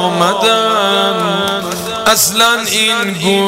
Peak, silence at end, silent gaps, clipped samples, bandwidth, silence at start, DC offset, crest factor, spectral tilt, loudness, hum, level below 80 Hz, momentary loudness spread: 0 dBFS; 0 s; none; under 0.1%; 16 kHz; 0 s; 0.1%; 12 dB; -2.5 dB/octave; -11 LUFS; none; -48 dBFS; 6 LU